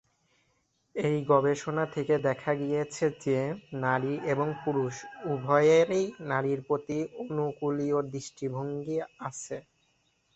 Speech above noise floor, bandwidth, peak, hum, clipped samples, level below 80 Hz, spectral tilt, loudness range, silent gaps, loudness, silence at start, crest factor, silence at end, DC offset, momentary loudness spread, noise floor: 44 dB; 8.2 kHz; -10 dBFS; none; under 0.1%; -68 dBFS; -6.5 dB/octave; 5 LU; none; -29 LUFS; 0.95 s; 20 dB; 0.75 s; under 0.1%; 12 LU; -73 dBFS